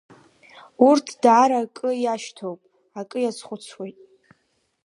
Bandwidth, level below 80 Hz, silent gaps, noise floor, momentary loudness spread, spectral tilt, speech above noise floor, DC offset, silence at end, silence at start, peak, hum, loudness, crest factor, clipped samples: 11 kHz; -78 dBFS; none; -69 dBFS; 21 LU; -4.5 dB/octave; 48 dB; under 0.1%; 0.95 s; 0.8 s; -2 dBFS; none; -20 LUFS; 20 dB; under 0.1%